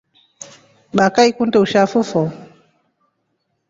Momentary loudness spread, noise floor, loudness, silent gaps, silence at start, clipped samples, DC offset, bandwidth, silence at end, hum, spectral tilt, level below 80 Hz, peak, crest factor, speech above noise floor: 24 LU; -70 dBFS; -16 LUFS; none; 0.95 s; under 0.1%; under 0.1%; 7.8 kHz; 1.25 s; none; -5 dB/octave; -58 dBFS; 0 dBFS; 18 dB; 55 dB